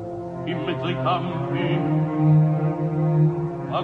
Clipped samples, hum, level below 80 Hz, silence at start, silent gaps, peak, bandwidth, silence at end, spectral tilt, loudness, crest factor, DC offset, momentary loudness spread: under 0.1%; none; -54 dBFS; 0 s; none; -8 dBFS; 4.3 kHz; 0 s; -9.5 dB/octave; -22 LUFS; 14 dB; under 0.1%; 9 LU